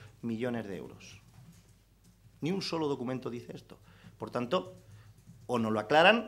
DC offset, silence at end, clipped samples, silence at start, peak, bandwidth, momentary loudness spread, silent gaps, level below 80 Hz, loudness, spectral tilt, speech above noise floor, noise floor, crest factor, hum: under 0.1%; 0 s; under 0.1%; 0 s; -8 dBFS; 15 kHz; 23 LU; none; -66 dBFS; -32 LUFS; -5.5 dB/octave; 31 dB; -62 dBFS; 26 dB; none